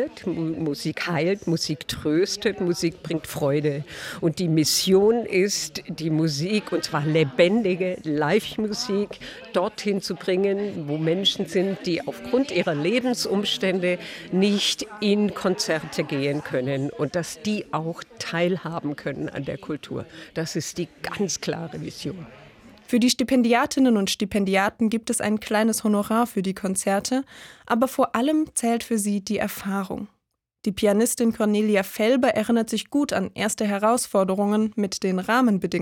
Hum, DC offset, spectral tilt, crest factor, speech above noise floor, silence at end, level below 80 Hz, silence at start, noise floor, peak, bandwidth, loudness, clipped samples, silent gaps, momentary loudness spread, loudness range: none; under 0.1%; -4.5 dB/octave; 18 dB; 29 dB; 0 s; -58 dBFS; 0 s; -52 dBFS; -6 dBFS; 18.5 kHz; -24 LUFS; under 0.1%; none; 10 LU; 6 LU